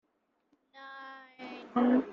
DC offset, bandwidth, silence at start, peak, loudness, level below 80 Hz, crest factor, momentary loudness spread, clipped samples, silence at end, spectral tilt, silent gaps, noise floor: under 0.1%; 5.6 kHz; 0.8 s; -16 dBFS; -29 LUFS; -74 dBFS; 18 dB; 21 LU; under 0.1%; 0 s; -7.5 dB/octave; none; -77 dBFS